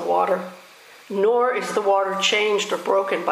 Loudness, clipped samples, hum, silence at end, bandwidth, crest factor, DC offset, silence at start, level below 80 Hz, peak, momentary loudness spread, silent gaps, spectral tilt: -21 LUFS; under 0.1%; none; 0 s; 15.5 kHz; 16 dB; under 0.1%; 0 s; -82 dBFS; -6 dBFS; 6 LU; none; -2.5 dB/octave